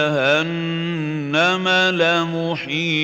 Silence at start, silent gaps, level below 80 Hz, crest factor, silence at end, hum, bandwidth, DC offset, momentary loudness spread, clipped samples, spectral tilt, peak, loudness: 0 s; none; -70 dBFS; 16 dB; 0 s; none; 16 kHz; under 0.1%; 7 LU; under 0.1%; -5 dB/octave; -4 dBFS; -18 LUFS